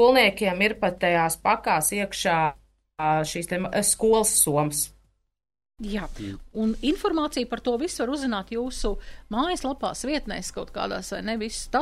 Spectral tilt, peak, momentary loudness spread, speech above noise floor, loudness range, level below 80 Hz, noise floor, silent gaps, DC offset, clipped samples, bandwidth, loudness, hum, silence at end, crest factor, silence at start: -3 dB/octave; -6 dBFS; 12 LU; 39 dB; 6 LU; -42 dBFS; -64 dBFS; none; under 0.1%; under 0.1%; 14 kHz; -25 LUFS; none; 0 s; 20 dB; 0 s